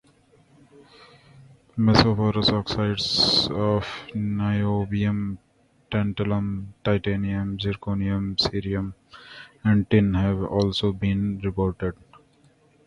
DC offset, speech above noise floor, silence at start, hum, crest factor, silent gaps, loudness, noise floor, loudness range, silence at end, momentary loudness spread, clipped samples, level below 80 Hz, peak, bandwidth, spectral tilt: under 0.1%; 36 dB; 1.4 s; none; 24 dB; none; -24 LUFS; -59 dBFS; 5 LU; 0.95 s; 12 LU; under 0.1%; -44 dBFS; 0 dBFS; 11 kHz; -6.5 dB/octave